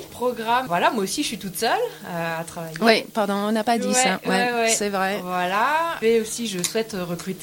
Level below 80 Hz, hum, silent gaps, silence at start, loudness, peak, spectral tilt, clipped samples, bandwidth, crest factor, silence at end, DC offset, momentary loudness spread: -60 dBFS; none; none; 0 s; -22 LUFS; -2 dBFS; -3 dB/octave; under 0.1%; 17 kHz; 20 dB; 0 s; under 0.1%; 9 LU